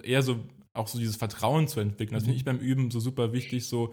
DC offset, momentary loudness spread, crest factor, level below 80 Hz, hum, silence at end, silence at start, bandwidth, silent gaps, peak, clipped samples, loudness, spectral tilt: under 0.1%; 7 LU; 16 dB; -62 dBFS; none; 0 s; 0.05 s; 18.5 kHz; none; -12 dBFS; under 0.1%; -29 LUFS; -6 dB/octave